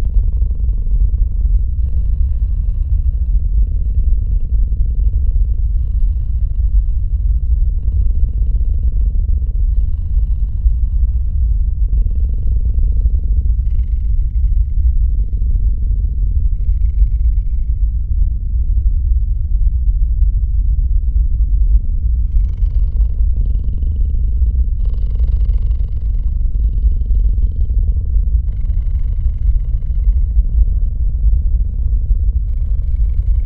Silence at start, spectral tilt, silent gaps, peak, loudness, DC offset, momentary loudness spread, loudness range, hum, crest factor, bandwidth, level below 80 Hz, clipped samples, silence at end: 0 s; -12 dB/octave; none; 0 dBFS; -18 LUFS; under 0.1%; 3 LU; 1 LU; none; 12 dB; 0.7 kHz; -14 dBFS; under 0.1%; 0 s